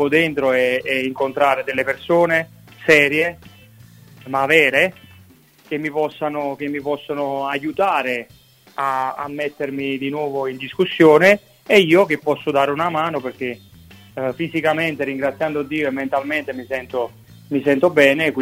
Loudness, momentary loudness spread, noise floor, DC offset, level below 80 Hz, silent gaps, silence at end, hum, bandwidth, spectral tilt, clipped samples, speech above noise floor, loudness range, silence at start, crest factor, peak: -18 LUFS; 13 LU; -49 dBFS; under 0.1%; -60 dBFS; none; 0 s; none; 16 kHz; -5.5 dB/octave; under 0.1%; 31 dB; 7 LU; 0 s; 20 dB; 0 dBFS